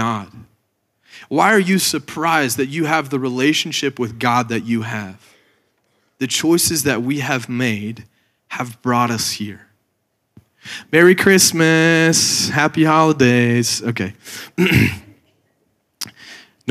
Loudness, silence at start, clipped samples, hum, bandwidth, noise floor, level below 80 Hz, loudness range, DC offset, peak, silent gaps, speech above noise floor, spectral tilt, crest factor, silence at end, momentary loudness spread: -16 LUFS; 0 s; under 0.1%; none; 15.5 kHz; -69 dBFS; -54 dBFS; 8 LU; under 0.1%; 0 dBFS; none; 53 dB; -4 dB/octave; 16 dB; 0 s; 18 LU